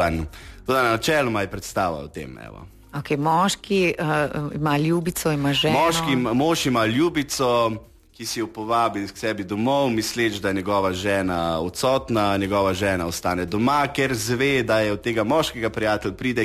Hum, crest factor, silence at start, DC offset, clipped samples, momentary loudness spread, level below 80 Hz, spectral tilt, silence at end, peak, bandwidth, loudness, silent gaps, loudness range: none; 14 dB; 0 s; under 0.1%; under 0.1%; 8 LU; -46 dBFS; -4.5 dB/octave; 0 s; -8 dBFS; 14 kHz; -22 LUFS; none; 3 LU